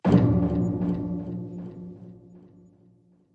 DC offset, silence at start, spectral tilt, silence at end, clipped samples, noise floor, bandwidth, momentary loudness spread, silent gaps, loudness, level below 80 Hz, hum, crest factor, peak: under 0.1%; 0.05 s; -10 dB/octave; 0.95 s; under 0.1%; -59 dBFS; 7.2 kHz; 23 LU; none; -26 LUFS; -46 dBFS; none; 22 dB; -6 dBFS